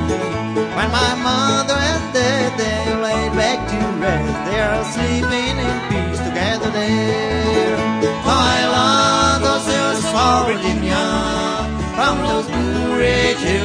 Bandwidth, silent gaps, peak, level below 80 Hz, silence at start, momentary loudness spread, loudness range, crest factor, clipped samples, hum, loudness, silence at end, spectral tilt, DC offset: 11 kHz; none; 0 dBFS; -32 dBFS; 0 s; 6 LU; 3 LU; 16 dB; under 0.1%; none; -17 LUFS; 0 s; -4.5 dB/octave; under 0.1%